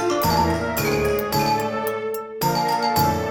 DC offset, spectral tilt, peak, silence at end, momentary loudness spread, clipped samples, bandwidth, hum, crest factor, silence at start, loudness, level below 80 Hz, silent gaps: under 0.1%; -4.5 dB/octave; -8 dBFS; 0 s; 6 LU; under 0.1%; 19.5 kHz; none; 14 dB; 0 s; -21 LUFS; -42 dBFS; none